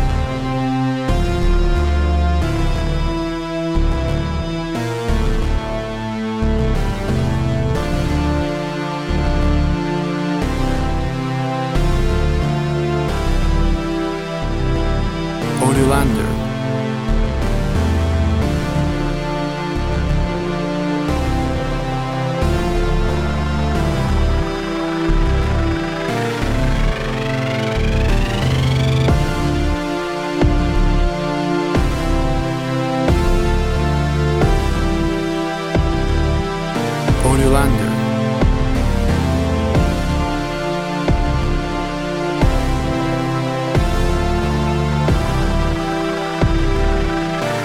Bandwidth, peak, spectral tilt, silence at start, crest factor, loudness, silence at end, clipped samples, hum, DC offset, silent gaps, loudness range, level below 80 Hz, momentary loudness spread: 14 kHz; 0 dBFS; -6.5 dB/octave; 0 s; 16 dB; -19 LUFS; 0 s; under 0.1%; none; under 0.1%; none; 2 LU; -20 dBFS; 5 LU